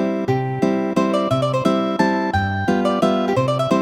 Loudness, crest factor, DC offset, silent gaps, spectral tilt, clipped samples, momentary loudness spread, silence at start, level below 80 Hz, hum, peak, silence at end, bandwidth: -19 LUFS; 14 dB; under 0.1%; none; -7 dB/octave; under 0.1%; 2 LU; 0 s; -48 dBFS; none; -4 dBFS; 0 s; 13 kHz